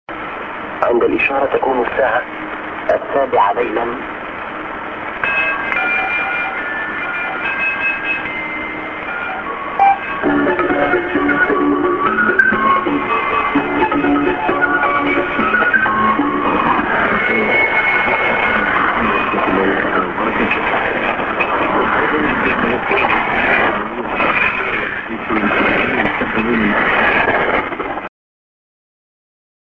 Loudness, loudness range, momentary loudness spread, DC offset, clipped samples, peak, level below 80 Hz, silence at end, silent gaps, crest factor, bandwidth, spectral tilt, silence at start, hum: -15 LUFS; 4 LU; 9 LU; under 0.1%; under 0.1%; 0 dBFS; -42 dBFS; 1.7 s; none; 16 dB; 7.2 kHz; -7 dB/octave; 0.1 s; none